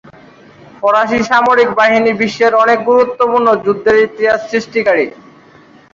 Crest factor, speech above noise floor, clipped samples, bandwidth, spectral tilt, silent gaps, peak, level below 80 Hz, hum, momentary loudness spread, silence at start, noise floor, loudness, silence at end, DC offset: 12 dB; 31 dB; under 0.1%; 7.6 kHz; -5 dB/octave; none; 0 dBFS; -50 dBFS; none; 5 LU; 0.8 s; -42 dBFS; -12 LUFS; 0.85 s; under 0.1%